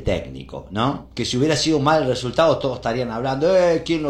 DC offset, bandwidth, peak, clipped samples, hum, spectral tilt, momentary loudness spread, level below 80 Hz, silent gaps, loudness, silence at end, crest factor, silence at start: under 0.1%; 12.5 kHz; -2 dBFS; under 0.1%; none; -5 dB/octave; 9 LU; -42 dBFS; none; -20 LUFS; 0 s; 18 dB; 0 s